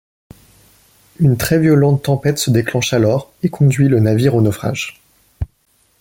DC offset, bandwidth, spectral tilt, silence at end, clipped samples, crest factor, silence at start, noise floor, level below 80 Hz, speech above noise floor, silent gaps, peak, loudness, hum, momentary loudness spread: under 0.1%; 17 kHz; -6.5 dB/octave; 0.55 s; under 0.1%; 14 dB; 1.2 s; -59 dBFS; -40 dBFS; 45 dB; none; -2 dBFS; -15 LUFS; none; 14 LU